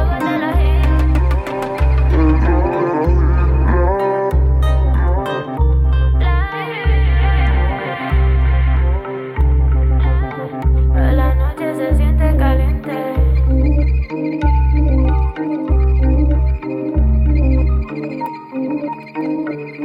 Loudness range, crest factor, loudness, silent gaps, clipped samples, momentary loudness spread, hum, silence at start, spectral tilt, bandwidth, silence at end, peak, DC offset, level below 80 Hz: 2 LU; 12 dB; -16 LUFS; none; under 0.1%; 7 LU; none; 0 s; -9 dB/octave; 4.5 kHz; 0 s; -2 dBFS; under 0.1%; -14 dBFS